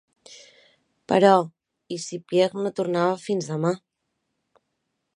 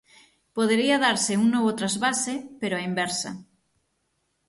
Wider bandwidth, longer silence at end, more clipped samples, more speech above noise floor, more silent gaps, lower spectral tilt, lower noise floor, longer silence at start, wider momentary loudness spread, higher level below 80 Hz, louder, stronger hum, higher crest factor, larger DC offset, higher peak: about the same, 10.5 kHz vs 11.5 kHz; first, 1.4 s vs 1.05 s; neither; first, 56 dB vs 50 dB; neither; first, -5.5 dB/octave vs -3 dB/octave; first, -78 dBFS vs -74 dBFS; second, 0.3 s vs 0.55 s; first, 16 LU vs 10 LU; second, -74 dBFS vs -68 dBFS; about the same, -23 LUFS vs -24 LUFS; neither; about the same, 22 dB vs 18 dB; neither; first, -2 dBFS vs -8 dBFS